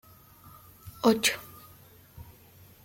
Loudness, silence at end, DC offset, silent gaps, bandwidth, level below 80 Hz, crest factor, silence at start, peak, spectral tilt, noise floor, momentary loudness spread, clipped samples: -26 LUFS; 0.65 s; under 0.1%; none; 16.5 kHz; -62 dBFS; 22 dB; 0.45 s; -10 dBFS; -3 dB/octave; -55 dBFS; 27 LU; under 0.1%